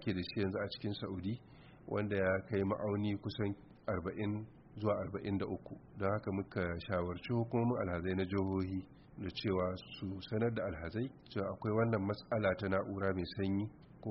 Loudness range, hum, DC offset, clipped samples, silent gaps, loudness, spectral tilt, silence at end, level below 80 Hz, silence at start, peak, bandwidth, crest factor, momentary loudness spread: 2 LU; none; under 0.1%; under 0.1%; none; -38 LUFS; -6 dB/octave; 0 s; -62 dBFS; 0 s; -20 dBFS; 5.8 kHz; 16 dB; 10 LU